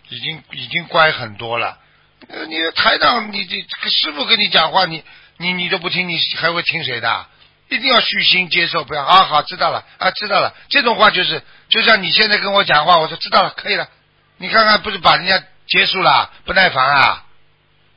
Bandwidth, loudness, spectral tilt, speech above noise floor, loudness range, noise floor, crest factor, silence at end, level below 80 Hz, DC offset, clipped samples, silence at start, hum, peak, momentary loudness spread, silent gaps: 8 kHz; -14 LUFS; -5.5 dB/octave; 39 dB; 4 LU; -54 dBFS; 16 dB; 0.75 s; -52 dBFS; under 0.1%; under 0.1%; 0.1 s; none; 0 dBFS; 11 LU; none